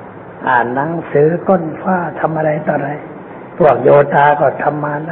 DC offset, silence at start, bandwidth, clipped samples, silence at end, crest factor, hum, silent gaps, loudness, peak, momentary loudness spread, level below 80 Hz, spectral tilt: under 0.1%; 0 s; 4.1 kHz; under 0.1%; 0 s; 14 dB; none; none; -14 LUFS; 0 dBFS; 15 LU; -52 dBFS; -10.5 dB/octave